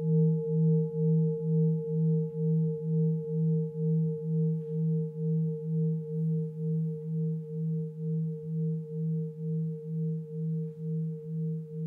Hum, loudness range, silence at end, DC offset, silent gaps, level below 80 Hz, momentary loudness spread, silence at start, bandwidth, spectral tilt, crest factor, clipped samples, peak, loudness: none; 5 LU; 0 s; under 0.1%; none; -72 dBFS; 7 LU; 0 s; 0.9 kHz; -14 dB/octave; 12 dB; under 0.1%; -18 dBFS; -31 LUFS